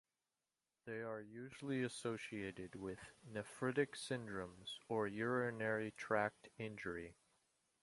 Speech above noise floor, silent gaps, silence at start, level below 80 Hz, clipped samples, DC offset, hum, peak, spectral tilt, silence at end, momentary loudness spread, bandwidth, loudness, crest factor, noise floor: over 46 dB; none; 0.85 s; -74 dBFS; under 0.1%; under 0.1%; none; -22 dBFS; -5.5 dB/octave; 0.7 s; 11 LU; 11.5 kHz; -44 LUFS; 22 dB; under -90 dBFS